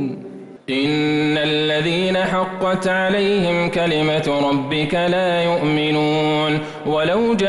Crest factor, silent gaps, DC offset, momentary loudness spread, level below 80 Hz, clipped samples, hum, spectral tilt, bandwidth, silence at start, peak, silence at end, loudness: 10 dB; none; under 0.1%; 4 LU; -50 dBFS; under 0.1%; none; -6 dB/octave; 11.5 kHz; 0 s; -10 dBFS; 0 s; -18 LUFS